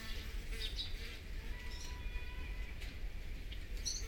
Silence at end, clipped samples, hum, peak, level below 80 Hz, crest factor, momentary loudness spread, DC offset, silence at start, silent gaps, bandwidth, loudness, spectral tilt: 0 s; under 0.1%; none; -26 dBFS; -44 dBFS; 16 dB; 7 LU; under 0.1%; 0 s; none; 18.5 kHz; -46 LUFS; -2.5 dB/octave